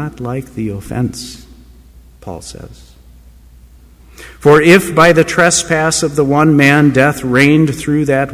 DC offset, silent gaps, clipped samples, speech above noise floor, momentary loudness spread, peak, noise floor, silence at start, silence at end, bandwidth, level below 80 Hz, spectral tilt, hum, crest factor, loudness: under 0.1%; none; under 0.1%; 29 dB; 20 LU; 0 dBFS; -41 dBFS; 0 s; 0 s; 16 kHz; -40 dBFS; -5 dB/octave; none; 12 dB; -11 LUFS